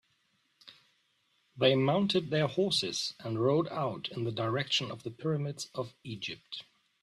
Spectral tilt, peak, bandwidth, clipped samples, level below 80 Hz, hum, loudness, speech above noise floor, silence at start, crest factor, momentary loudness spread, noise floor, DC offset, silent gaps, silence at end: -5 dB/octave; -12 dBFS; 13 kHz; under 0.1%; -72 dBFS; none; -31 LUFS; 42 dB; 0.65 s; 20 dB; 13 LU; -74 dBFS; under 0.1%; none; 0.4 s